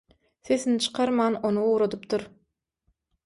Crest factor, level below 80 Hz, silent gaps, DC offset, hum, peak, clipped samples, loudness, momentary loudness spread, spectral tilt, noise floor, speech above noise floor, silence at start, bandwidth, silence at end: 16 dB; -66 dBFS; none; under 0.1%; none; -12 dBFS; under 0.1%; -25 LUFS; 7 LU; -4.5 dB/octave; -75 dBFS; 50 dB; 0.45 s; 11.5 kHz; 1 s